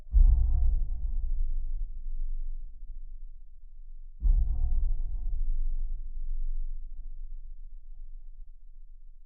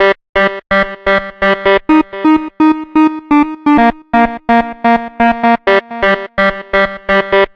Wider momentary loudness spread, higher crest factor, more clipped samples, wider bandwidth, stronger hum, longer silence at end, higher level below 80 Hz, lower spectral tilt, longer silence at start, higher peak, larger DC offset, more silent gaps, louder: first, 23 LU vs 4 LU; first, 18 dB vs 12 dB; neither; second, 0.8 kHz vs 6.6 kHz; neither; about the same, 0 s vs 0.1 s; first, -28 dBFS vs -36 dBFS; first, -14.5 dB/octave vs -6.5 dB/octave; about the same, 0 s vs 0 s; second, -10 dBFS vs 0 dBFS; neither; second, none vs 0.29-0.33 s; second, -34 LUFS vs -12 LUFS